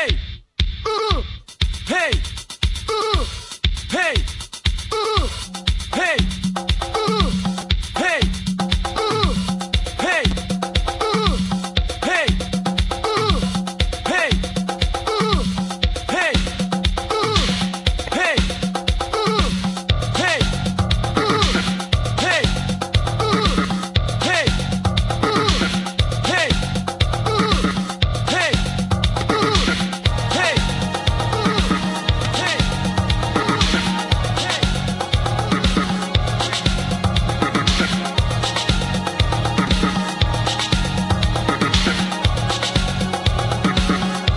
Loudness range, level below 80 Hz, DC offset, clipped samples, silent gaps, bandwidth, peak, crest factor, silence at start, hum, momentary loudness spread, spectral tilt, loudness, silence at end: 2 LU; -26 dBFS; under 0.1%; under 0.1%; none; 11.5 kHz; -2 dBFS; 18 dB; 0 s; none; 5 LU; -4.5 dB/octave; -19 LUFS; 0 s